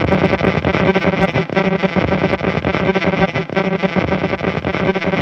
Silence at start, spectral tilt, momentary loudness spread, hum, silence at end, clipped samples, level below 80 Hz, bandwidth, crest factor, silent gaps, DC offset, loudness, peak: 0 s; -7.5 dB/octave; 3 LU; none; 0 s; under 0.1%; -36 dBFS; 7.2 kHz; 16 dB; none; under 0.1%; -16 LUFS; 0 dBFS